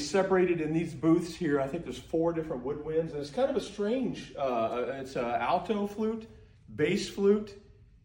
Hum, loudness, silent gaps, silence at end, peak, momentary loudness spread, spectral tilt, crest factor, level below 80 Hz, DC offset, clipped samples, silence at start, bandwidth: none; -30 LUFS; none; 0.45 s; -14 dBFS; 8 LU; -6 dB/octave; 16 dB; -58 dBFS; under 0.1%; under 0.1%; 0 s; 16.5 kHz